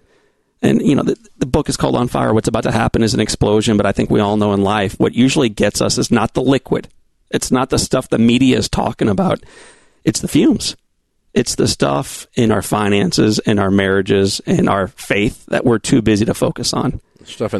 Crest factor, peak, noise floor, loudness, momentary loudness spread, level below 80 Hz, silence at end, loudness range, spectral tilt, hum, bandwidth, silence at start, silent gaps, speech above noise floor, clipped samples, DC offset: 14 dB; 0 dBFS; -61 dBFS; -16 LUFS; 7 LU; -38 dBFS; 0 s; 2 LU; -5 dB/octave; none; 12.5 kHz; 0.6 s; none; 46 dB; under 0.1%; 0.3%